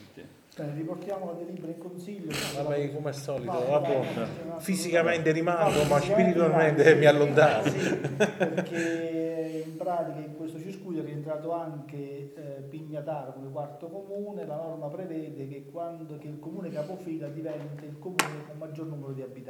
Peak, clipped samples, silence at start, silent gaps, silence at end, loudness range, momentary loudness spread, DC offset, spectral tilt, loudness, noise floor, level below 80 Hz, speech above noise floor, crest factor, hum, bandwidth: -4 dBFS; under 0.1%; 0 s; none; 0 s; 15 LU; 17 LU; under 0.1%; -5.5 dB/octave; -28 LUFS; -50 dBFS; -64 dBFS; 22 dB; 24 dB; none; 19 kHz